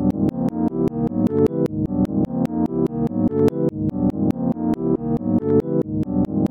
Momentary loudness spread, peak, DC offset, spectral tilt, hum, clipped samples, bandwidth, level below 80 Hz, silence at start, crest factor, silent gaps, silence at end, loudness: 4 LU; -4 dBFS; under 0.1%; -10.5 dB/octave; none; under 0.1%; 9.2 kHz; -42 dBFS; 0 s; 16 dB; none; 0.05 s; -21 LUFS